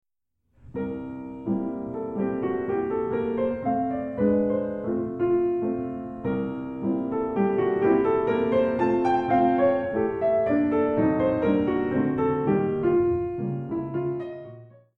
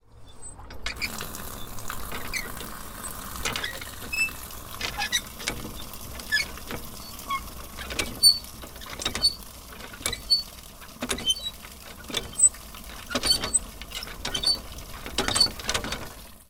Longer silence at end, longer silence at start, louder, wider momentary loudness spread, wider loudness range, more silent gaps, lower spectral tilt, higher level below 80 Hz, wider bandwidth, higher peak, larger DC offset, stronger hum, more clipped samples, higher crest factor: first, 0.3 s vs 0.05 s; first, 0.65 s vs 0.15 s; about the same, -25 LUFS vs -26 LUFS; second, 10 LU vs 19 LU; about the same, 5 LU vs 7 LU; neither; first, -10 dB/octave vs -0.5 dB/octave; second, -54 dBFS vs -44 dBFS; second, 5.8 kHz vs 18 kHz; second, -10 dBFS vs -6 dBFS; neither; neither; neither; second, 16 dB vs 24 dB